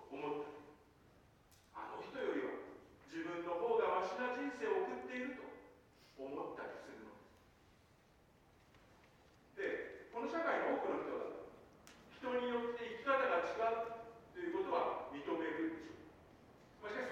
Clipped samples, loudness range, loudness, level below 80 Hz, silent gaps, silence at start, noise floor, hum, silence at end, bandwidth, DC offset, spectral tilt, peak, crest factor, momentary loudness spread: under 0.1%; 13 LU; -42 LUFS; -76 dBFS; none; 0 s; -69 dBFS; none; 0 s; 14.5 kHz; under 0.1%; -5 dB/octave; -22 dBFS; 20 dB; 21 LU